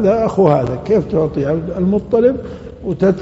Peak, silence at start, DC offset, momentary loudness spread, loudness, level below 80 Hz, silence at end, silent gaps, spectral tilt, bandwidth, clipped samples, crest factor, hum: 0 dBFS; 0 s; under 0.1%; 12 LU; -16 LUFS; -38 dBFS; 0 s; none; -8.5 dB/octave; 8 kHz; under 0.1%; 14 dB; none